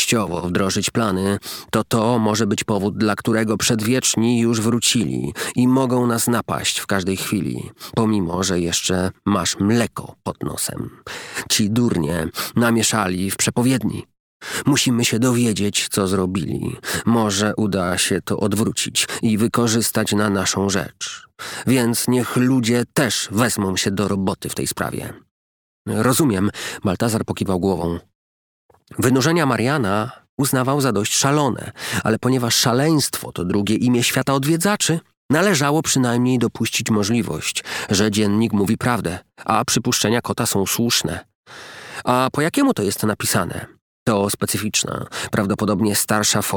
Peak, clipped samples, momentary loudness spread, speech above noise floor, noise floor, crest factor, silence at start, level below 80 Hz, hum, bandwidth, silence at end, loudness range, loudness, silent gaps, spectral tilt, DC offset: -2 dBFS; under 0.1%; 9 LU; over 71 dB; under -90 dBFS; 18 dB; 0 s; -50 dBFS; none; over 20 kHz; 0 s; 3 LU; -19 LUFS; 14.20-14.40 s, 25.31-25.85 s, 28.15-28.69 s, 30.29-30.38 s, 35.17-35.29 s, 41.35-41.44 s, 43.81-44.06 s; -4 dB/octave; under 0.1%